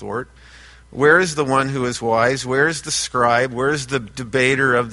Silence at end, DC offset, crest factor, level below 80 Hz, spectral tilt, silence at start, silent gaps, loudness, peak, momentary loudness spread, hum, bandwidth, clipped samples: 0 s; under 0.1%; 18 dB; -48 dBFS; -4 dB/octave; 0 s; none; -18 LUFS; -2 dBFS; 10 LU; none; 11.5 kHz; under 0.1%